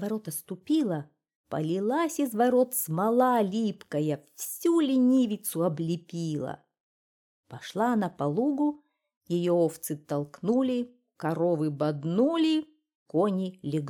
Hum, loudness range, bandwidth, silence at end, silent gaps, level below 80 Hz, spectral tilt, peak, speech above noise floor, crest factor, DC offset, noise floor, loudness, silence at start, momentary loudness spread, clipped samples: none; 5 LU; 19 kHz; 0 s; 1.35-1.44 s, 6.80-7.43 s, 9.17-9.21 s, 12.95-13.06 s; -74 dBFS; -6 dB/octave; -12 dBFS; over 63 dB; 16 dB; under 0.1%; under -90 dBFS; -28 LUFS; 0 s; 11 LU; under 0.1%